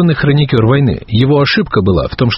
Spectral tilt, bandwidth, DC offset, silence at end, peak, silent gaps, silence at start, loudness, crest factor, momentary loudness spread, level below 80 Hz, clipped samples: -5.5 dB/octave; 5.8 kHz; under 0.1%; 0 s; 0 dBFS; none; 0 s; -11 LUFS; 10 dB; 3 LU; -32 dBFS; under 0.1%